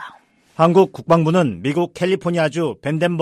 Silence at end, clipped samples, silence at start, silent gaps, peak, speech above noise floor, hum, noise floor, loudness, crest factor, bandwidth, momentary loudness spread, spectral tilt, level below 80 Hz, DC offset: 0 s; under 0.1%; 0 s; none; -2 dBFS; 30 dB; none; -47 dBFS; -18 LUFS; 16 dB; 13 kHz; 8 LU; -7 dB/octave; -56 dBFS; under 0.1%